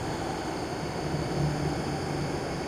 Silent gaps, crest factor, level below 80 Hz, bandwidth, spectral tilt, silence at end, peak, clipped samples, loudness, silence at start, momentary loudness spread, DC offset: none; 14 dB; -46 dBFS; 15 kHz; -5.5 dB/octave; 0 s; -16 dBFS; under 0.1%; -31 LUFS; 0 s; 4 LU; under 0.1%